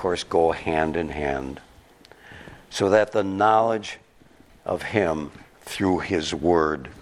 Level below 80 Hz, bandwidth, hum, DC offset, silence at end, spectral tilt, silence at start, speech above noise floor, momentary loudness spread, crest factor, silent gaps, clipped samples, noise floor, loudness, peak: -48 dBFS; 15 kHz; none; under 0.1%; 0 s; -5.5 dB/octave; 0 s; 31 dB; 19 LU; 22 dB; none; under 0.1%; -54 dBFS; -23 LUFS; -4 dBFS